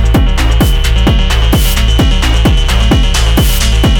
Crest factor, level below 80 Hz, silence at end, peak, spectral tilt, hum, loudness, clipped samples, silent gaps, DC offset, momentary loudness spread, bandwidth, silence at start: 8 dB; -10 dBFS; 0 s; 0 dBFS; -4.5 dB/octave; none; -10 LUFS; under 0.1%; none; under 0.1%; 1 LU; 19 kHz; 0 s